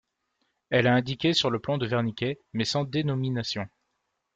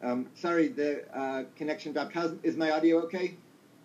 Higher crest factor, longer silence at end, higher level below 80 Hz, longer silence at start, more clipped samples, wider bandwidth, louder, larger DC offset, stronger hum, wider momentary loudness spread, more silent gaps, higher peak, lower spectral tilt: about the same, 18 dB vs 16 dB; first, 0.7 s vs 0.45 s; first, -62 dBFS vs under -90 dBFS; first, 0.7 s vs 0 s; neither; about the same, 8.4 kHz vs 7.8 kHz; first, -27 LUFS vs -31 LUFS; neither; neither; about the same, 9 LU vs 9 LU; neither; first, -10 dBFS vs -16 dBFS; about the same, -5.5 dB/octave vs -6 dB/octave